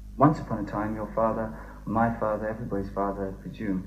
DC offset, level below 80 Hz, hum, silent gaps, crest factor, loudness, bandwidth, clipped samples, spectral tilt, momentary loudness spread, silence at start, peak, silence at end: under 0.1%; -44 dBFS; none; none; 24 dB; -28 LUFS; 15 kHz; under 0.1%; -9 dB/octave; 12 LU; 0 s; -4 dBFS; 0 s